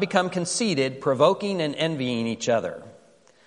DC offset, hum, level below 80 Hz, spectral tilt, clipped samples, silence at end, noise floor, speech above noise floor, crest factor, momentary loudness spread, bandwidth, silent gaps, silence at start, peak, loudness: under 0.1%; none; -68 dBFS; -4.5 dB/octave; under 0.1%; 0.55 s; -56 dBFS; 32 dB; 22 dB; 6 LU; 11.5 kHz; none; 0 s; -4 dBFS; -24 LUFS